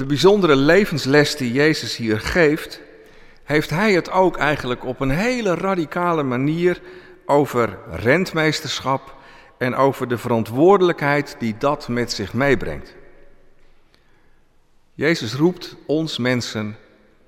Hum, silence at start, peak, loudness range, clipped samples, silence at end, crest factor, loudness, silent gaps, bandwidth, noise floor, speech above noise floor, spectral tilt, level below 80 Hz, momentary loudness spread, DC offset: none; 0 s; -4 dBFS; 6 LU; under 0.1%; 0.5 s; 16 dB; -19 LUFS; none; 16.5 kHz; -54 dBFS; 35 dB; -5.5 dB/octave; -42 dBFS; 11 LU; under 0.1%